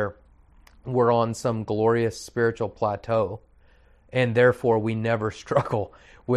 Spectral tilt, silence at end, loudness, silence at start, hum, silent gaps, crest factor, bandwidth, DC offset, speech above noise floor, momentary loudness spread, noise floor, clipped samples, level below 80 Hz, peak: -6.5 dB/octave; 0 s; -24 LUFS; 0 s; none; none; 18 dB; 12.5 kHz; under 0.1%; 32 dB; 11 LU; -56 dBFS; under 0.1%; -54 dBFS; -6 dBFS